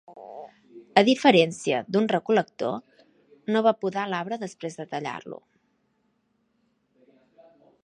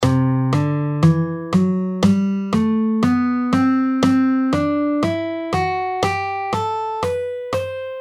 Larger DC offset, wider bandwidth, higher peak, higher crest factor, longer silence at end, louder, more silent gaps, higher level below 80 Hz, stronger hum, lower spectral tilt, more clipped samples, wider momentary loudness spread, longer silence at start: neither; about the same, 11.5 kHz vs 12.5 kHz; about the same, -2 dBFS vs -2 dBFS; first, 26 dB vs 16 dB; first, 2.5 s vs 0 s; second, -24 LUFS vs -19 LUFS; neither; second, -76 dBFS vs -48 dBFS; neither; second, -5 dB/octave vs -7.5 dB/octave; neither; first, 24 LU vs 6 LU; about the same, 0.1 s vs 0 s